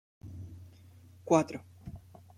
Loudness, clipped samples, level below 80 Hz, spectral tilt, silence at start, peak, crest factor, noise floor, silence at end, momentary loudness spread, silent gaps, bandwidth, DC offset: -29 LUFS; under 0.1%; -62 dBFS; -6.5 dB/octave; 0.25 s; -10 dBFS; 26 dB; -56 dBFS; 0.4 s; 24 LU; none; 14 kHz; under 0.1%